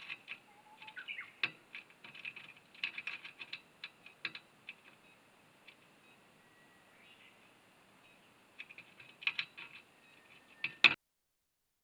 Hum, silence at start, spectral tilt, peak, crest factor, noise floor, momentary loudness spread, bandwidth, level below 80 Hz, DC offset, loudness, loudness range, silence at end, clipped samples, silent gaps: none; 0 s; -1.5 dB/octave; -6 dBFS; 38 dB; -84 dBFS; 23 LU; over 20 kHz; -90 dBFS; under 0.1%; -37 LUFS; 25 LU; 0.9 s; under 0.1%; none